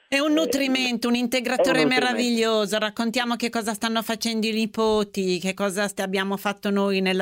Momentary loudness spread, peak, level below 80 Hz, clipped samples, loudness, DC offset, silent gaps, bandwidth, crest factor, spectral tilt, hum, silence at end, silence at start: 5 LU; -8 dBFS; -62 dBFS; under 0.1%; -23 LUFS; under 0.1%; none; 16 kHz; 16 dB; -4 dB/octave; none; 0 s; 0.1 s